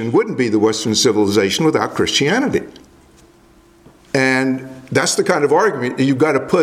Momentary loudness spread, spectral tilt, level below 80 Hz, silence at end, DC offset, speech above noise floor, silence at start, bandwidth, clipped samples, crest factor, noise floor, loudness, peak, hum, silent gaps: 6 LU; -4 dB/octave; -54 dBFS; 0 s; under 0.1%; 33 dB; 0 s; 15.5 kHz; under 0.1%; 16 dB; -49 dBFS; -16 LUFS; 0 dBFS; none; none